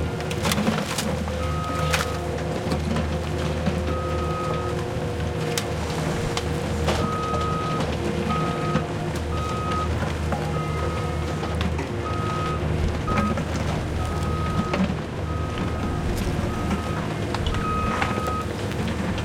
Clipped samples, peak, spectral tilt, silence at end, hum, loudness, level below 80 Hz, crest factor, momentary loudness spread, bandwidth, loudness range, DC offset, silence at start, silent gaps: under 0.1%; -6 dBFS; -5.5 dB/octave; 0 s; none; -26 LUFS; -36 dBFS; 18 dB; 4 LU; 17 kHz; 1 LU; under 0.1%; 0 s; none